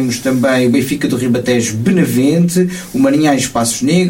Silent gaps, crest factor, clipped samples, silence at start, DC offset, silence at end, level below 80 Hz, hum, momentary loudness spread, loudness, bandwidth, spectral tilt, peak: none; 10 dB; under 0.1%; 0 s; under 0.1%; 0 s; -46 dBFS; none; 4 LU; -13 LUFS; 17 kHz; -5 dB/octave; -2 dBFS